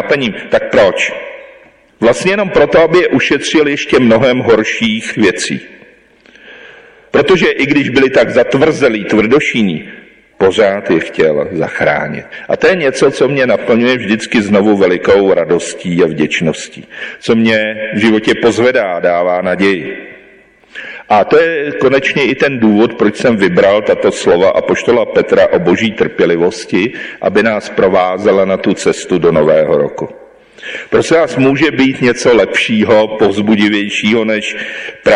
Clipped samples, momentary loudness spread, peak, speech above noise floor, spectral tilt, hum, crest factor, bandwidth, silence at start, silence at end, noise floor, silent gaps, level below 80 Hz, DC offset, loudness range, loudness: under 0.1%; 8 LU; -2 dBFS; 33 dB; -5 dB/octave; none; 10 dB; 11 kHz; 0 s; 0 s; -44 dBFS; none; -44 dBFS; under 0.1%; 3 LU; -11 LUFS